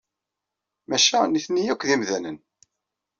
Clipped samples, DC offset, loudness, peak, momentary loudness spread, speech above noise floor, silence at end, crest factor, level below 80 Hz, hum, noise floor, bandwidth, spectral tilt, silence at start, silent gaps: under 0.1%; under 0.1%; -22 LUFS; -6 dBFS; 14 LU; 63 dB; 0.85 s; 20 dB; -68 dBFS; none; -85 dBFS; 7.6 kHz; -1.5 dB/octave; 0.9 s; none